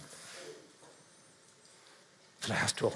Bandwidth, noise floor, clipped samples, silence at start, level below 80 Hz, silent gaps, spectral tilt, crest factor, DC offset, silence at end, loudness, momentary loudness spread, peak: 12 kHz; -61 dBFS; under 0.1%; 0 s; -76 dBFS; none; -3 dB/octave; 22 dB; under 0.1%; 0 s; -36 LUFS; 27 LU; -18 dBFS